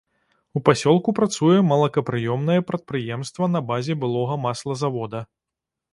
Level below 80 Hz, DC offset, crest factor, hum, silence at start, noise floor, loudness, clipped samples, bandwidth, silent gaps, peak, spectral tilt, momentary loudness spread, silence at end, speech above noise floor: -60 dBFS; under 0.1%; 22 dB; none; 0.55 s; -86 dBFS; -22 LUFS; under 0.1%; 11.5 kHz; none; 0 dBFS; -6.5 dB/octave; 11 LU; 0.7 s; 65 dB